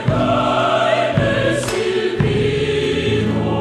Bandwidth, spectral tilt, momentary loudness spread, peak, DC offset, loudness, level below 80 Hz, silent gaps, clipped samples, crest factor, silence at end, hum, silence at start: 13 kHz; -6 dB/octave; 3 LU; -2 dBFS; under 0.1%; -17 LUFS; -38 dBFS; none; under 0.1%; 14 dB; 0 s; none; 0 s